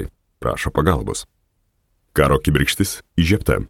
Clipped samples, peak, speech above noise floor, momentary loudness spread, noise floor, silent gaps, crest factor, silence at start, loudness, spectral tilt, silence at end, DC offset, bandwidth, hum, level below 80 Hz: under 0.1%; -2 dBFS; 48 dB; 11 LU; -66 dBFS; none; 18 dB; 0 s; -19 LUFS; -5 dB/octave; 0 s; under 0.1%; 18 kHz; none; -32 dBFS